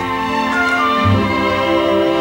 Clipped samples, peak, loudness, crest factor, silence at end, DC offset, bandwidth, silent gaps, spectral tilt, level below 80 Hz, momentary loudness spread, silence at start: under 0.1%; -2 dBFS; -15 LUFS; 12 dB; 0 s; under 0.1%; 17 kHz; none; -6 dB/octave; -40 dBFS; 3 LU; 0 s